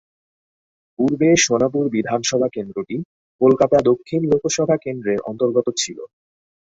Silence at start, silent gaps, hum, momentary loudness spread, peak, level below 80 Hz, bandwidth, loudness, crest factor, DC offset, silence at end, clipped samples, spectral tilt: 1 s; 3.05-3.39 s; none; 12 LU; -2 dBFS; -56 dBFS; 8 kHz; -19 LUFS; 18 dB; under 0.1%; 0.7 s; under 0.1%; -4.5 dB/octave